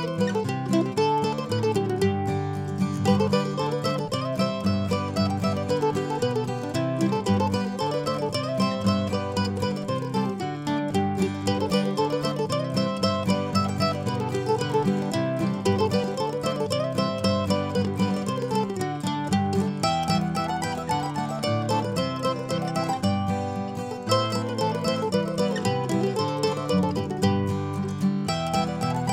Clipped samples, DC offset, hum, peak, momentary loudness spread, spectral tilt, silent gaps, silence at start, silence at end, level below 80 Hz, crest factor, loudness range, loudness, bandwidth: under 0.1%; under 0.1%; none; -8 dBFS; 4 LU; -6 dB/octave; none; 0 s; 0 s; -56 dBFS; 16 dB; 1 LU; -26 LUFS; 15.5 kHz